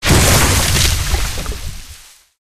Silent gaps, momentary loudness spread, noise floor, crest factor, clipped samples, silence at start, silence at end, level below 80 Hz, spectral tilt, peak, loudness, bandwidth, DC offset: none; 19 LU; -39 dBFS; 14 dB; under 0.1%; 0 s; 0.4 s; -20 dBFS; -3 dB/octave; -2 dBFS; -13 LUFS; 15.5 kHz; under 0.1%